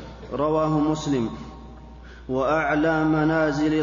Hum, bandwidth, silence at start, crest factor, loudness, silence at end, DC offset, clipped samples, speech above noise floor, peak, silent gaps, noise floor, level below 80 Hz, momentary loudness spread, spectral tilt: none; 7.4 kHz; 0 s; 12 dB; -23 LUFS; 0 s; under 0.1%; under 0.1%; 20 dB; -10 dBFS; none; -42 dBFS; -44 dBFS; 19 LU; -7 dB/octave